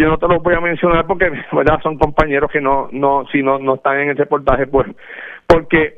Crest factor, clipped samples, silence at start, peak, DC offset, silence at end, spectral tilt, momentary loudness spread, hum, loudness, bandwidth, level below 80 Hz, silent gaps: 14 dB; under 0.1%; 0 s; 0 dBFS; under 0.1%; 0.1 s; -8 dB/octave; 3 LU; none; -15 LUFS; 7.6 kHz; -30 dBFS; none